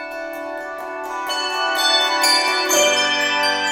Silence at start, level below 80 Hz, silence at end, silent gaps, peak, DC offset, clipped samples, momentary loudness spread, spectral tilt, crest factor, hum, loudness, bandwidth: 0 s; -60 dBFS; 0 s; none; -4 dBFS; under 0.1%; under 0.1%; 14 LU; 0.5 dB/octave; 16 dB; none; -16 LUFS; 18 kHz